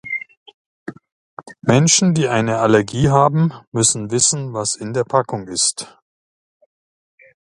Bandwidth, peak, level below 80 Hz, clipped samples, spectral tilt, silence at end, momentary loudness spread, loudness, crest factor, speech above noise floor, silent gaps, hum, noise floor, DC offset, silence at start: 11.5 kHz; 0 dBFS; -48 dBFS; under 0.1%; -4 dB/octave; 1.55 s; 18 LU; -16 LUFS; 18 dB; over 73 dB; 0.37-0.46 s, 0.54-0.86 s, 1.12-1.37 s, 3.67-3.72 s; none; under -90 dBFS; under 0.1%; 0.05 s